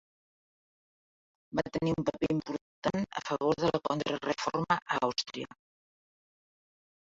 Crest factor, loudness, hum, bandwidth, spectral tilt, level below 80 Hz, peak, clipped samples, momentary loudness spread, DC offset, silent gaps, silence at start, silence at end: 24 dB; -32 LUFS; none; 7.8 kHz; -5.5 dB/octave; -62 dBFS; -12 dBFS; under 0.1%; 7 LU; under 0.1%; 2.61-2.82 s; 1.5 s; 1.6 s